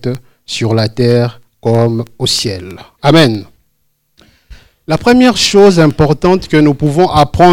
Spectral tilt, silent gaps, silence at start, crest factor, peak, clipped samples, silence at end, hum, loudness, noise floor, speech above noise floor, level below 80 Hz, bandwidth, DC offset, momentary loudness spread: -5.5 dB/octave; none; 0 s; 10 dB; 0 dBFS; 2%; 0 s; none; -10 LUFS; -62 dBFS; 52 dB; -36 dBFS; 16.5 kHz; under 0.1%; 13 LU